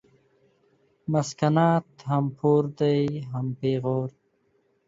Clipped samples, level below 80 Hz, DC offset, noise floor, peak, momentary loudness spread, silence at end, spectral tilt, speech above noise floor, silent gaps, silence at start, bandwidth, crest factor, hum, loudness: under 0.1%; -64 dBFS; under 0.1%; -68 dBFS; -8 dBFS; 9 LU; 0.8 s; -7.5 dB/octave; 44 dB; none; 1.1 s; 7.8 kHz; 18 dB; none; -25 LUFS